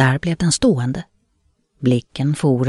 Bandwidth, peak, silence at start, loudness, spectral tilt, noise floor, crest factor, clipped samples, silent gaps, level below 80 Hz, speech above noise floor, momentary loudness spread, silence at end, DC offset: 11.5 kHz; -4 dBFS; 0 s; -19 LUFS; -5.5 dB/octave; -64 dBFS; 16 dB; under 0.1%; none; -44 dBFS; 47 dB; 7 LU; 0 s; under 0.1%